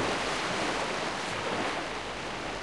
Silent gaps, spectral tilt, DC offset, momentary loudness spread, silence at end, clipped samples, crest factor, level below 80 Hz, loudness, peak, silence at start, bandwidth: none; -3 dB/octave; 0.2%; 5 LU; 0 s; under 0.1%; 16 dB; -54 dBFS; -31 LUFS; -18 dBFS; 0 s; 13 kHz